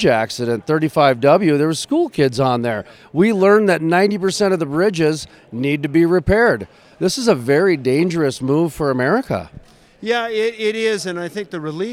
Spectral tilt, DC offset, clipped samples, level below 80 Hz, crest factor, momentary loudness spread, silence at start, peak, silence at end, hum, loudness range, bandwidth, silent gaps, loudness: -5.5 dB/octave; under 0.1%; under 0.1%; -44 dBFS; 16 dB; 11 LU; 0 s; 0 dBFS; 0 s; none; 4 LU; 15.5 kHz; none; -17 LUFS